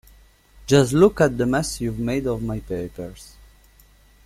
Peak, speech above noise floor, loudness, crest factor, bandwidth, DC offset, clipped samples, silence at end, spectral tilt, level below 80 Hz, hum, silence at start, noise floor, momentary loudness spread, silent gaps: -4 dBFS; 33 dB; -21 LUFS; 20 dB; 15.5 kHz; under 0.1%; under 0.1%; 1 s; -6 dB/octave; -42 dBFS; none; 0.6 s; -53 dBFS; 18 LU; none